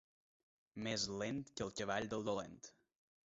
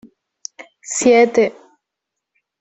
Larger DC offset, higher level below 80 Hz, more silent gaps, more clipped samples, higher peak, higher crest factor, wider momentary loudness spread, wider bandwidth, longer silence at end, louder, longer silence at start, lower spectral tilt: neither; second, -70 dBFS vs -62 dBFS; neither; neither; second, -24 dBFS vs -2 dBFS; about the same, 20 dB vs 16 dB; second, 16 LU vs 23 LU; second, 7.6 kHz vs 8.4 kHz; second, 0.65 s vs 1.1 s; second, -42 LUFS vs -15 LUFS; first, 0.75 s vs 0.6 s; about the same, -3.5 dB/octave vs -3 dB/octave